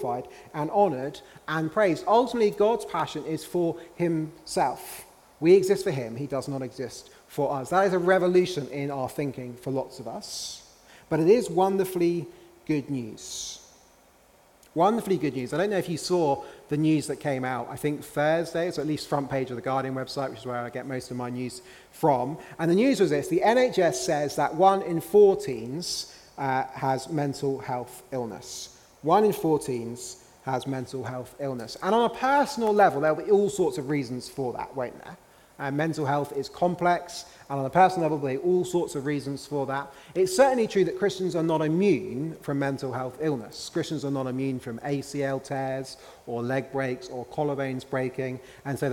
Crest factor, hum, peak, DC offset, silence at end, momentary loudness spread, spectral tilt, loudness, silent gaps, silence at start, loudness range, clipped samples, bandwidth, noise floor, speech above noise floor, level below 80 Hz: 20 dB; none; -6 dBFS; under 0.1%; 0 s; 14 LU; -5.5 dB/octave; -27 LUFS; none; 0 s; 6 LU; under 0.1%; 17.5 kHz; -58 dBFS; 32 dB; -62 dBFS